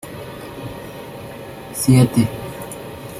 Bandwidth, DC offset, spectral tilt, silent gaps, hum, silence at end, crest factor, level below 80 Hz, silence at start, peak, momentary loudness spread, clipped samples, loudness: 16 kHz; under 0.1%; -6 dB/octave; none; none; 0 s; 18 dB; -46 dBFS; 0.05 s; -2 dBFS; 20 LU; under 0.1%; -17 LUFS